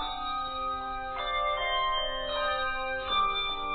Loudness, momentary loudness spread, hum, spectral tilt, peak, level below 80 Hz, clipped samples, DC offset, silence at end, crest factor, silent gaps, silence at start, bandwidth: -30 LUFS; 6 LU; none; -6 dB/octave; -16 dBFS; -46 dBFS; under 0.1%; under 0.1%; 0 s; 14 dB; none; 0 s; 4.7 kHz